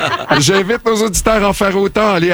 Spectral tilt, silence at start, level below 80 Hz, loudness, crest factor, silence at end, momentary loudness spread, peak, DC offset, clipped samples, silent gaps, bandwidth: -4 dB/octave; 0 s; -32 dBFS; -13 LUFS; 12 dB; 0 s; 3 LU; -2 dBFS; under 0.1%; under 0.1%; none; over 20 kHz